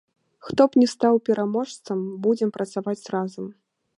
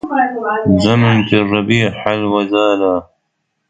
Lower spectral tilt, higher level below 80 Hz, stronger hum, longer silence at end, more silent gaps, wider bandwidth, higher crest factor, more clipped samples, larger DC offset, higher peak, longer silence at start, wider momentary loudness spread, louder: about the same, -6 dB/octave vs -7 dB/octave; second, -68 dBFS vs -42 dBFS; neither; second, 0.5 s vs 0.65 s; neither; first, 11 kHz vs 9 kHz; first, 20 dB vs 14 dB; neither; neither; second, -4 dBFS vs 0 dBFS; first, 0.45 s vs 0.05 s; first, 11 LU vs 6 LU; second, -23 LUFS vs -14 LUFS